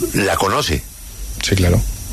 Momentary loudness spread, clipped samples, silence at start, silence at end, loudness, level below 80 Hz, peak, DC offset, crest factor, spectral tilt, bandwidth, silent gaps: 16 LU; under 0.1%; 0 s; 0 s; -17 LUFS; -28 dBFS; 0 dBFS; under 0.1%; 18 dB; -4.5 dB/octave; 14 kHz; none